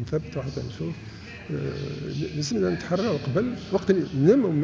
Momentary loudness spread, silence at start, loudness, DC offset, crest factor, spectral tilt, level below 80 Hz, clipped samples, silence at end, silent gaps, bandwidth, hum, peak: 14 LU; 0 s; -26 LUFS; under 0.1%; 18 dB; -7 dB/octave; -50 dBFS; under 0.1%; 0 s; none; 7.6 kHz; none; -6 dBFS